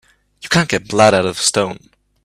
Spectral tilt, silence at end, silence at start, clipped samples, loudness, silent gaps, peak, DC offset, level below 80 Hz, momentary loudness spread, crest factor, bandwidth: -3.5 dB/octave; 0.45 s; 0.45 s; under 0.1%; -15 LUFS; none; 0 dBFS; under 0.1%; -50 dBFS; 16 LU; 16 dB; 14.5 kHz